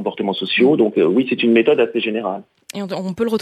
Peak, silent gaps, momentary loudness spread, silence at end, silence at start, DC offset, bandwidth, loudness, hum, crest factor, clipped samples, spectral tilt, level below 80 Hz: -4 dBFS; none; 13 LU; 0.05 s; 0 s; under 0.1%; 13.5 kHz; -17 LUFS; none; 14 dB; under 0.1%; -6 dB/octave; -66 dBFS